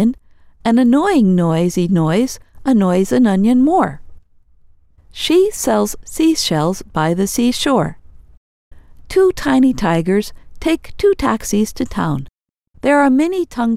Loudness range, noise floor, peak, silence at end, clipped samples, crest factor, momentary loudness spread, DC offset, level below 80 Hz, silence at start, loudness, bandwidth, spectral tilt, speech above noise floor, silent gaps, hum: 3 LU; -50 dBFS; 0 dBFS; 0 s; under 0.1%; 16 dB; 9 LU; under 0.1%; -40 dBFS; 0 s; -15 LUFS; 16 kHz; -5.5 dB/octave; 35 dB; 8.37-8.71 s; none